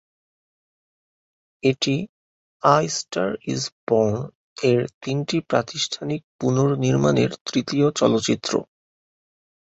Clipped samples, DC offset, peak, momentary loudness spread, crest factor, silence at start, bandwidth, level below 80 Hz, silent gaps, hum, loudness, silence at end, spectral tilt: under 0.1%; under 0.1%; -2 dBFS; 8 LU; 20 dB; 1.65 s; 8.2 kHz; -58 dBFS; 2.09-2.60 s, 3.72-3.87 s, 4.35-4.56 s, 4.94-5.01 s, 6.24-6.39 s, 7.41-7.46 s; none; -22 LUFS; 1.05 s; -5 dB/octave